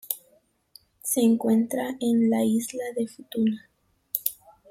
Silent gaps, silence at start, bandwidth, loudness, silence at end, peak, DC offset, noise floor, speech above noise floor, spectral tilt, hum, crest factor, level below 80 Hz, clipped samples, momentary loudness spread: none; 0.1 s; 16.5 kHz; -26 LUFS; 0.4 s; -6 dBFS; under 0.1%; -64 dBFS; 40 dB; -5 dB/octave; none; 20 dB; -70 dBFS; under 0.1%; 11 LU